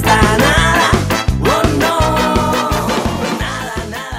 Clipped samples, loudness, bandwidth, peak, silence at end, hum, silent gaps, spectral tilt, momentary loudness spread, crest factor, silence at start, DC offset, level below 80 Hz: under 0.1%; -14 LUFS; 16.5 kHz; 0 dBFS; 0 s; none; none; -4.5 dB/octave; 9 LU; 12 dB; 0 s; under 0.1%; -24 dBFS